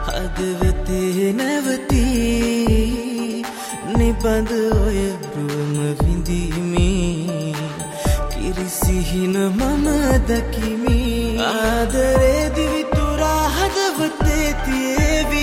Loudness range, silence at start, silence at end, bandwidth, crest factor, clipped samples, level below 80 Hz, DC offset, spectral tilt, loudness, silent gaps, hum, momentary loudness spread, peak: 3 LU; 0 s; 0 s; 16.5 kHz; 14 dB; under 0.1%; -24 dBFS; under 0.1%; -5.5 dB/octave; -19 LUFS; none; none; 7 LU; -4 dBFS